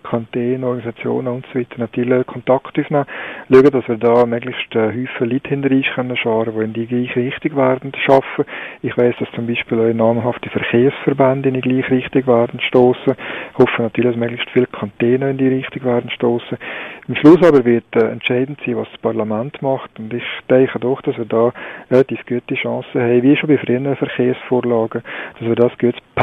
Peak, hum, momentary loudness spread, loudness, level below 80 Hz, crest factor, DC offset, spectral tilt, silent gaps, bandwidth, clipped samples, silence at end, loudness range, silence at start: 0 dBFS; none; 10 LU; -16 LUFS; -54 dBFS; 16 dB; under 0.1%; -8.5 dB/octave; none; 6.2 kHz; under 0.1%; 0 s; 4 LU; 0.05 s